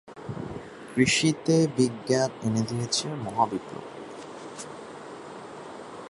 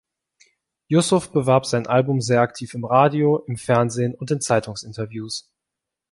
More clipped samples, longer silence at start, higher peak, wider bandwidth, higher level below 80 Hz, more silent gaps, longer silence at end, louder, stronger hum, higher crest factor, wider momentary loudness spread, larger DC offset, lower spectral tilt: neither; second, 0.05 s vs 0.9 s; second, -8 dBFS vs -2 dBFS; about the same, 11.5 kHz vs 11.5 kHz; about the same, -60 dBFS vs -58 dBFS; neither; second, 0 s vs 0.7 s; second, -26 LUFS vs -20 LUFS; neither; about the same, 20 dB vs 18 dB; first, 19 LU vs 13 LU; neither; about the same, -4.5 dB/octave vs -5.5 dB/octave